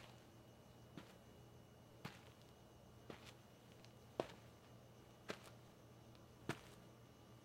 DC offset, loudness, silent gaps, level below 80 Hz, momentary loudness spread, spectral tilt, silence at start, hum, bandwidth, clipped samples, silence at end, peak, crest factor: under 0.1%; -58 LUFS; none; -78 dBFS; 13 LU; -5 dB/octave; 0 s; none; 16 kHz; under 0.1%; 0 s; -24 dBFS; 34 dB